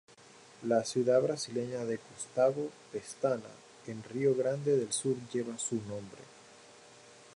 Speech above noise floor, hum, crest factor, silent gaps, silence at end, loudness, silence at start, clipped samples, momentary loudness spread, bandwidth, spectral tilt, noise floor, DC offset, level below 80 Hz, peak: 24 dB; none; 18 dB; none; 0.15 s; -33 LUFS; 0.6 s; under 0.1%; 16 LU; 11.5 kHz; -5 dB/octave; -57 dBFS; under 0.1%; -76 dBFS; -16 dBFS